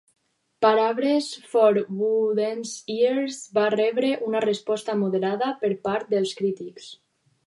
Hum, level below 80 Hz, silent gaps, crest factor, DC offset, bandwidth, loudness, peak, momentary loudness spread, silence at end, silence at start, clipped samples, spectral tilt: none; -74 dBFS; none; 18 dB; under 0.1%; 11.5 kHz; -24 LUFS; -6 dBFS; 8 LU; 0.55 s; 0.6 s; under 0.1%; -5 dB/octave